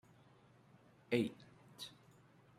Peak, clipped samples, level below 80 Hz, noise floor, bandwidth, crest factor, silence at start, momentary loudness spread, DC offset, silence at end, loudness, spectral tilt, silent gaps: -20 dBFS; under 0.1%; -82 dBFS; -67 dBFS; 15.5 kHz; 26 dB; 1.1 s; 23 LU; under 0.1%; 0.7 s; -42 LUFS; -6 dB/octave; none